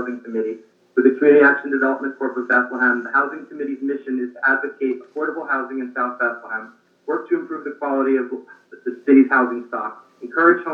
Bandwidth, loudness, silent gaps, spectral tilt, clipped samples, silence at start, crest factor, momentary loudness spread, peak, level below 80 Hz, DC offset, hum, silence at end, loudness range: 4.6 kHz; -20 LUFS; none; -8 dB/octave; under 0.1%; 0 s; 18 dB; 16 LU; -2 dBFS; under -90 dBFS; under 0.1%; none; 0 s; 6 LU